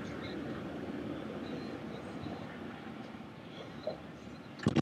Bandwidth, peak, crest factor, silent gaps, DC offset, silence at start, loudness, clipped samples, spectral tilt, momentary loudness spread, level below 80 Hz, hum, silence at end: 14 kHz; -16 dBFS; 24 dB; none; under 0.1%; 0 s; -42 LUFS; under 0.1%; -6.5 dB/octave; 7 LU; -64 dBFS; none; 0 s